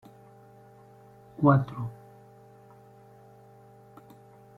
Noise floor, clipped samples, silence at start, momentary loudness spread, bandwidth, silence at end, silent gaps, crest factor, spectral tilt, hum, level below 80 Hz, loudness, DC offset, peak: -53 dBFS; under 0.1%; 1.4 s; 30 LU; 4.3 kHz; 2.65 s; none; 26 dB; -10.5 dB/octave; 50 Hz at -65 dBFS; -64 dBFS; -26 LUFS; under 0.1%; -6 dBFS